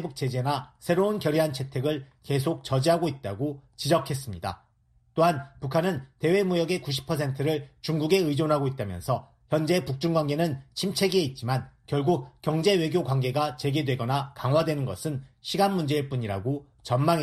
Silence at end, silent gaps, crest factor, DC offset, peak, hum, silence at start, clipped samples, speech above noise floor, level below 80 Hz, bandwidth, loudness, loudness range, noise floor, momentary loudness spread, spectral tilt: 0 s; none; 18 dB; under 0.1%; -8 dBFS; none; 0 s; under 0.1%; 38 dB; -58 dBFS; 14.5 kHz; -27 LUFS; 2 LU; -64 dBFS; 8 LU; -6 dB/octave